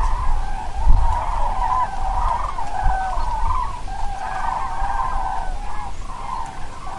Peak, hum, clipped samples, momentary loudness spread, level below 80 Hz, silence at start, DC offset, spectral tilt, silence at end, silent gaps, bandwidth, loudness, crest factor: 0 dBFS; none; under 0.1%; 10 LU; -22 dBFS; 0 s; under 0.1%; -5 dB/octave; 0 s; none; 11 kHz; -25 LUFS; 18 dB